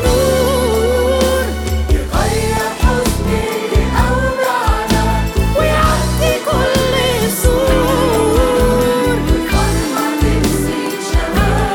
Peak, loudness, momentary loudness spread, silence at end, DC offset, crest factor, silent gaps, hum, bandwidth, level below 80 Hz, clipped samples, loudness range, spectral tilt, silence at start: 0 dBFS; -14 LUFS; 4 LU; 0 s; under 0.1%; 14 dB; none; none; 19 kHz; -20 dBFS; under 0.1%; 2 LU; -5 dB/octave; 0 s